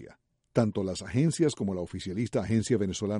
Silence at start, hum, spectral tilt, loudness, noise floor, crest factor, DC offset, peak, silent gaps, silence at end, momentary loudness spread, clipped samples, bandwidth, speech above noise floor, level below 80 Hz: 0 s; none; -6.5 dB/octave; -29 LUFS; -55 dBFS; 18 dB; under 0.1%; -10 dBFS; none; 0 s; 7 LU; under 0.1%; 11.5 kHz; 27 dB; -56 dBFS